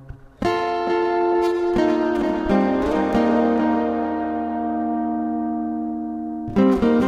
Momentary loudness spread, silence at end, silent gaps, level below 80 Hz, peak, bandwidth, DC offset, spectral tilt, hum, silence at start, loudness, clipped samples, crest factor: 7 LU; 0 s; none; -44 dBFS; -6 dBFS; 10 kHz; under 0.1%; -7.5 dB/octave; none; 0 s; -21 LUFS; under 0.1%; 14 dB